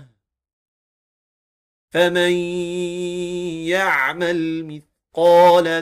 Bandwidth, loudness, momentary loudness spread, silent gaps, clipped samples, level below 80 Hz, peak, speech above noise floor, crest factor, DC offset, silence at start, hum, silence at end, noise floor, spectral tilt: 15.5 kHz; -18 LUFS; 14 LU; 0.53-1.88 s; under 0.1%; -60 dBFS; -4 dBFS; 36 dB; 14 dB; under 0.1%; 0 s; none; 0 s; -53 dBFS; -5 dB/octave